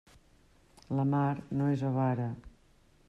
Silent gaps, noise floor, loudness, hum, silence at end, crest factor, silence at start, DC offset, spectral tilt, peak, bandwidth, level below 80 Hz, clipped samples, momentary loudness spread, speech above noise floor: none; -64 dBFS; -32 LUFS; none; 0.6 s; 12 dB; 0.9 s; under 0.1%; -9.5 dB/octave; -20 dBFS; 7.4 kHz; -62 dBFS; under 0.1%; 8 LU; 33 dB